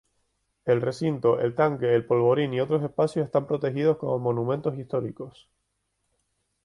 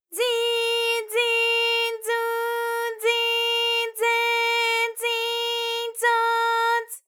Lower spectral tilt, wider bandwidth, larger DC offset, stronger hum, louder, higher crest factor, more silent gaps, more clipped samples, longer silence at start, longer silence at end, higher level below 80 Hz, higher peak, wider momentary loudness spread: first, -8 dB/octave vs 4.5 dB/octave; second, 11 kHz vs over 20 kHz; neither; neither; second, -25 LUFS vs -22 LUFS; about the same, 16 dB vs 16 dB; neither; neither; first, 0.65 s vs 0.1 s; first, 1.35 s vs 0.1 s; first, -64 dBFS vs under -90 dBFS; about the same, -10 dBFS vs -8 dBFS; first, 8 LU vs 5 LU